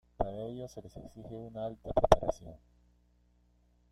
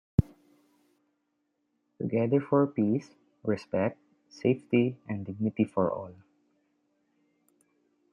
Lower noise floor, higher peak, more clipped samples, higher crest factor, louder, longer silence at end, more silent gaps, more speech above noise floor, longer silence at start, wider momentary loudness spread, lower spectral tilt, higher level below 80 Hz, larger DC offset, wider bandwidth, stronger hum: second, -68 dBFS vs -78 dBFS; first, -4 dBFS vs -8 dBFS; neither; first, 30 dB vs 24 dB; second, -33 LUFS vs -29 LUFS; second, 1.35 s vs 2 s; neither; second, 35 dB vs 50 dB; about the same, 0.2 s vs 0.2 s; first, 22 LU vs 12 LU; second, -6 dB/octave vs -9 dB/octave; first, -46 dBFS vs -54 dBFS; neither; first, 13.5 kHz vs 9.6 kHz; first, 60 Hz at -60 dBFS vs none